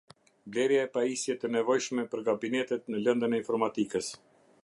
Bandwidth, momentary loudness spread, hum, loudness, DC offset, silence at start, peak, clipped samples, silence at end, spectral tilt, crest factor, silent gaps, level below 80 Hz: 11.5 kHz; 6 LU; none; -30 LUFS; under 0.1%; 0.45 s; -12 dBFS; under 0.1%; 0.45 s; -4 dB/octave; 18 dB; none; -76 dBFS